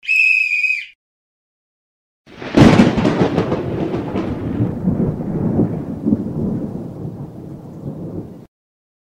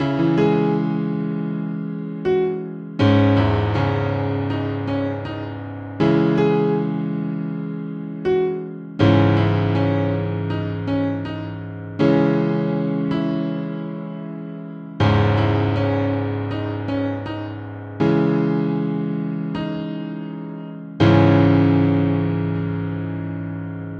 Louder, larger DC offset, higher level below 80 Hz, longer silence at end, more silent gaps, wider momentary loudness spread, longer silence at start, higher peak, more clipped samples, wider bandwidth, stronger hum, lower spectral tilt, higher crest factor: first, -16 LUFS vs -21 LUFS; neither; first, -40 dBFS vs -46 dBFS; first, 0.75 s vs 0 s; first, 0.95-2.25 s vs none; first, 20 LU vs 14 LU; about the same, 0.05 s vs 0 s; about the same, 0 dBFS vs -2 dBFS; neither; first, 13 kHz vs 6.6 kHz; neither; second, -7 dB/octave vs -9 dB/octave; about the same, 18 dB vs 18 dB